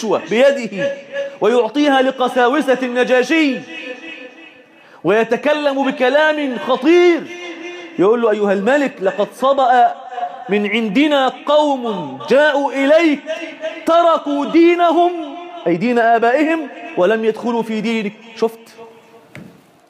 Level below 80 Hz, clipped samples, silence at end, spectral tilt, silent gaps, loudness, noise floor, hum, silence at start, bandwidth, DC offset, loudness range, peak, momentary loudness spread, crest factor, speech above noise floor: -70 dBFS; under 0.1%; 0.45 s; -5 dB/octave; none; -15 LUFS; -44 dBFS; none; 0 s; 13 kHz; under 0.1%; 3 LU; -4 dBFS; 13 LU; 12 dB; 29 dB